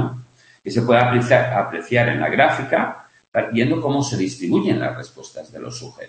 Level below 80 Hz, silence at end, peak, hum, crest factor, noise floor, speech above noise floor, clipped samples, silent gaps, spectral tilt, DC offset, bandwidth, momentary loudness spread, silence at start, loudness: -58 dBFS; 0 s; 0 dBFS; none; 18 dB; -39 dBFS; 20 dB; under 0.1%; 3.28-3.32 s; -6 dB/octave; under 0.1%; 8.8 kHz; 19 LU; 0 s; -19 LUFS